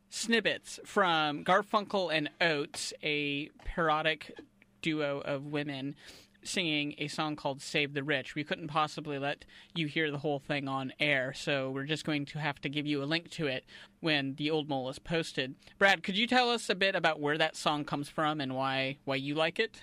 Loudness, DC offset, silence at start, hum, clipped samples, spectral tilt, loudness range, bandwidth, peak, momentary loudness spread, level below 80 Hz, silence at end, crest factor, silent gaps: -32 LUFS; under 0.1%; 0.1 s; none; under 0.1%; -4 dB/octave; 5 LU; 15.5 kHz; -14 dBFS; 9 LU; -60 dBFS; 0 s; 20 dB; none